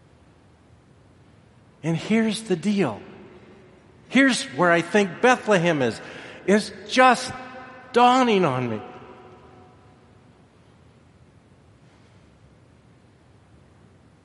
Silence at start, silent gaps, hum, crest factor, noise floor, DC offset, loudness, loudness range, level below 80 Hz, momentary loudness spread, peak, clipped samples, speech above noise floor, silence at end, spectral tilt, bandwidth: 1.85 s; none; none; 22 dB; -54 dBFS; under 0.1%; -21 LUFS; 7 LU; -64 dBFS; 20 LU; -2 dBFS; under 0.1%; 34 dB; 5.1 s; -5 dB/octave; 11.5 kHz